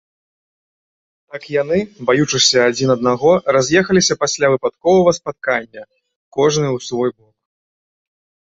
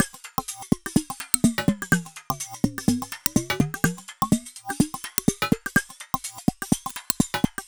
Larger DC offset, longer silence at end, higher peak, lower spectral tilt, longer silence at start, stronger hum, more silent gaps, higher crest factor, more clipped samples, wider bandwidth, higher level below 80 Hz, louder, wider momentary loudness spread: second, under 0.1% vs 0.2%; first, 1.35 s vs 0.05 s; about the same, 0 dBFS vs -2 dBFS; about the same, -4 dB/octave vs -4 dB/octave; first, 1.35 s vs 0 s; neither; first, 6.16-6.32 s vs none; second, 18 dB vs 24 dB; neither; second, 8 kHz vs over 20 kHz; second, -54 dBFS vs -46 dBFS; first, -15 LUFS vs -25 LUFS; about the same, 10 LU vs 8 LU